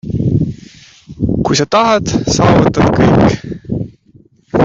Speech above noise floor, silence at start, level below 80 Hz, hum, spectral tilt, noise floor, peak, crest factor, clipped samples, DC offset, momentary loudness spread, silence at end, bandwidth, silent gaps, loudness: 36 dB; 0.05 s; -32 dBFS; none; -6 dB/octave; -46 dBFS; 0 dBFS; 12 dB; under 0.1%; under 0.1%; 13 LU; 0 s; 7.8 kHz; none; -13 LUFS